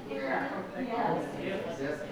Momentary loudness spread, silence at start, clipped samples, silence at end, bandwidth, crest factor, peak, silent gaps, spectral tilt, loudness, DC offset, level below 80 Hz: 5 LU; 0 s; under 0.1%; 0 s; over 20 kHz; 14 dB; -18 dBFS; none; -6 dB/octave; -34 LUFS; under 0.1%; -62 dBFS